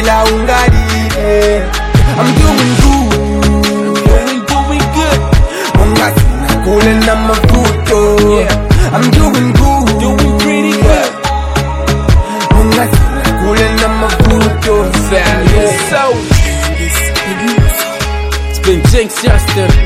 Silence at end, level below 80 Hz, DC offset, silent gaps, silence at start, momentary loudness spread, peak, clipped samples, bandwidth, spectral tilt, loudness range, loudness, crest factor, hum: 0 s; -14 dBFS; under 0.1%; none; 0 s; 4 LU; 0 dBFS; 2%; 16 kHz; -5 dB/octave; 2 LU; -10 LUFS; 8 dB; none